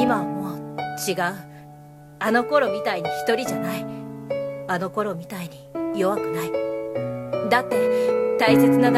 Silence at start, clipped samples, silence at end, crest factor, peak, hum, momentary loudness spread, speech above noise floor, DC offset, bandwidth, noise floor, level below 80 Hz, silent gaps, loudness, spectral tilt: 0 s; under 0.1%; 0 s; 18 dB; -4 dBFS; none; 12 LU; 23 dB; under 0.1%; 15.5 kHz; -44 dBFS; -62 dBFS; none; -23 LUFS; -5.5 dB/octave